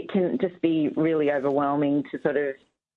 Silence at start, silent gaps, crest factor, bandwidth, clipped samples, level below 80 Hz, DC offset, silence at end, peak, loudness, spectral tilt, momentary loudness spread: 0 s; none; 16 dB; 4.2 kHz; under 0.1%; -70 dBFS; under 0.1%; 0.4 s; -8 dBFS; -25 LUFS; -9.5 dB/octave; 4 LU